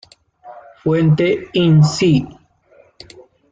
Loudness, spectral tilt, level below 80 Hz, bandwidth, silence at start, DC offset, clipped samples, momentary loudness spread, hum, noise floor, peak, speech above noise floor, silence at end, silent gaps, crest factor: -15 LUFS; -7 dB/octave; -50 dBFS; 7.8 kHz; 0.45 s; under 0.1%; under 0.1%; 9 LU; none; -51 dBFS; -4 dBFS; 38 dB; 1.2 s; none; 14 dB